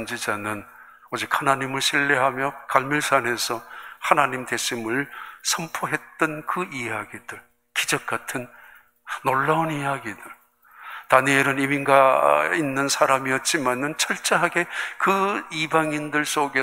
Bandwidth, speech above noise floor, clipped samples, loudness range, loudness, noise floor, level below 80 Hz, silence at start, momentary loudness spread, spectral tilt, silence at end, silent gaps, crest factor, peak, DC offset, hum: 16 kHz; 27 dB; under 0.1%; 7 LU; -22 LUFS; -50 dBFS; -66 dBFS; 0 s; 13 LU; -3 dB/octave; 0 s; none; 22 dB; -2 dBFS; under 0.1%; 60 Hz at -60 dBFS